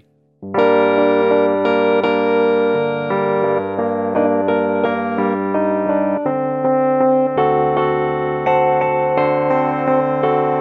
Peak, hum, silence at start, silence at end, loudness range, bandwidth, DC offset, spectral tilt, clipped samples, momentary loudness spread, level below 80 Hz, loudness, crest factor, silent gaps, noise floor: -2 dBFS; none; 0.4 s; 0 s; 2 LU; 5.4 kHz; under 0.1%; -9 dB/octave; under 0.1%; 4 LU; -56 dBFS; -16 LUFS; 14 dB; none; -37 dBFS